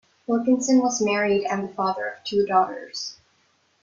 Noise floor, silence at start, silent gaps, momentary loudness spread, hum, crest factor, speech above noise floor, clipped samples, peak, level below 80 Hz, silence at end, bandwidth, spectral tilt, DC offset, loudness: -65 dBFS; 0.3 s; none; 12 LU; none; 18 dB; 42 dB; under 0.1%; -6 dBFS; -66 dBFS; 0.7 s; 7.6 kHz; -4 dB/octave; under 0.1%; -23 LUFS